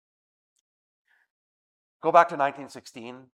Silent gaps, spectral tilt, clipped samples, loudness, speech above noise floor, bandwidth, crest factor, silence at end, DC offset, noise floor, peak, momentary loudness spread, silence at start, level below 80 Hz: none; -5 dB/octave; under 0.1%; -23 LUFS; over 66 dB; 11.5 kHz; 24 dB; 0.2 s; under 0.1%; under -90 dBFS; -4 dBFS; 22 LU; 2.05 s; -86 dBFS